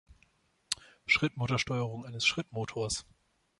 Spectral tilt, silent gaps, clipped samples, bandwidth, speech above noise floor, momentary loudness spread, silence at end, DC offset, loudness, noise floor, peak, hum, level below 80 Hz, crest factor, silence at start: -3.5 dB/octave; none; under 0.1%; 11.5 kHz; 37 dB; 10 LU; 0.55 s; under 0.1%; -32 LUFS; -70 dBFS; -10 dBFS; none; -60 dBFS; 24 dB; 0.7 s